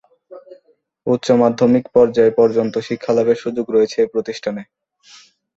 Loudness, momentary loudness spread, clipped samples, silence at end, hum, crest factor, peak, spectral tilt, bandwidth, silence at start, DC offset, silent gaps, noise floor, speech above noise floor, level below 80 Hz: -16 LUFS; 11 LU; under 0.1%; 0.95 s; none; 16 dB; -2 dBFS; -6.5 dB/octave; 7.8 kHz; 0.3 s; under 0.1%; none; -55 dBFS; 39 dB; -58 dBFS